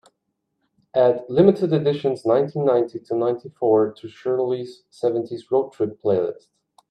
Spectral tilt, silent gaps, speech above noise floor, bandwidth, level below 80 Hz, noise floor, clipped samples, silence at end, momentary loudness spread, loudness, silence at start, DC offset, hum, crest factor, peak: -8.5 dB/octave; none; 55 dB; 9.2 kHz; -66 dBFS; -76 dBFS; under 0.1%; 0.55 s; 9 LU; -21 LUFS; 0.95 s; under 0.1%; none; 20 dB; -2 dBFS